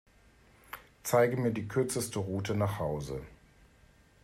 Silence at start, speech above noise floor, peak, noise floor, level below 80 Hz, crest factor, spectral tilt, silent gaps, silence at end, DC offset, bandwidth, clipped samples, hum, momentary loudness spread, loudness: 0.7 s; 31 dB; -14 dBFS; -62 dBFS; -58 dBFS; 20 dB; -5.5 dB/octave; none; 0.9 s; under 0.1%; 16 kHz; under 0.1%; none; 21 LU; -32 LUFS